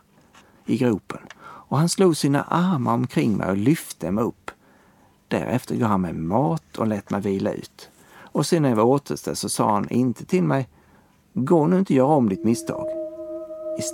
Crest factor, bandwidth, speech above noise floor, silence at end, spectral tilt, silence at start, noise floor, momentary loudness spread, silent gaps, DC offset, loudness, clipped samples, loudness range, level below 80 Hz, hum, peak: 18 dB; 17.5 kHz; 35 dB; 0 s; -6.5 dB/octave; 0.65 s; -56 dBFS; 15 LU; none; under 0.1%; -22 LUFS; under 0.1%; 3 LU; -58 dBFS; none; -4 dBFS